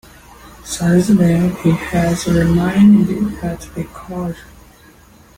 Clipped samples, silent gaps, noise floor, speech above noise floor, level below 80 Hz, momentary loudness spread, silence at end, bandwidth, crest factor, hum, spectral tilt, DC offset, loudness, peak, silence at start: under 0.1%; none; -45 dBFS; 31 dB; -36 dBFS; 17 LU; 0.95 s; 16 kHz; 14 dB; none; -7 dB/octave; under 0.1%; -15 LUFS; -2 dBFS; 0.45 s